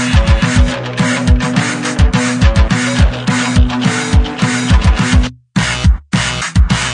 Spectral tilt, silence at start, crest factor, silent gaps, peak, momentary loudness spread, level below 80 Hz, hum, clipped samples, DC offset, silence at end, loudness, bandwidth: -5 dB/octave; 0 s; 12 dB; none; 0 dBFS; 4 LU; -16 dBFS; none; under 0.1%; under 0.1%; 0 s; -13 LUFS; 10 kHz